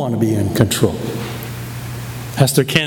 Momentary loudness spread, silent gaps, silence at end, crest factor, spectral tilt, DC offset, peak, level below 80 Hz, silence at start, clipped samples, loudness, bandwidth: 13 LU; none; 0 s; 18 dB; -5 dB/octave; under 0.1%; 0 dBFS; -42 dBFS; 0 s; under 0.1%; -18 LUFS; over 20 kHz